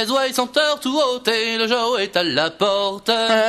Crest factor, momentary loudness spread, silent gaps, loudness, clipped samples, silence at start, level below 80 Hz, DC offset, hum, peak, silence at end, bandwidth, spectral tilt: 16 dB; 1 LU; none; -19 LUFS; under 0.1%; 0 s; -60 dBFS; under 0.1%; none; -2 dBFS; 0 s; 15.5 kHz; -2.5 dB/octave